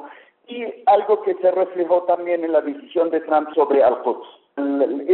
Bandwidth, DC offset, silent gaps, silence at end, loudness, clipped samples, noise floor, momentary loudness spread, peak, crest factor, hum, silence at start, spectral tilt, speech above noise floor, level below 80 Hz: 4.2 kHz; under 0.1%; none; 0 s; -19 LUFS; under 0.1%; -42 dBFS; 12 LU; -6 dBFS; 14 dB; none; 0 s; -3 dB/octave; 24 dB; -70 dBFS